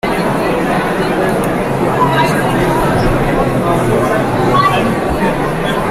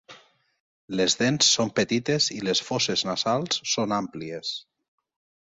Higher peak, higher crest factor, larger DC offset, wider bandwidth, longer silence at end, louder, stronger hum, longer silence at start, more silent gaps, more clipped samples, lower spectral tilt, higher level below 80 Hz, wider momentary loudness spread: first, -2 dBFS vs -6 dBFS; second, 12 dB vs 20 dB; neither; first, 16 kHz vs 8 kHz; second, 0 s vs 0.8 s; first, -13 LUFS vs -24 LUFS; neither; about the same, 0.05 s vs 0.1 s; second, none vs 0.60-0.88 s; neither; first, -6 dB/octave vs -3 dB/octave; first, -28 dBFS vs -64 dBFS; second, 3 LU vs 13 LU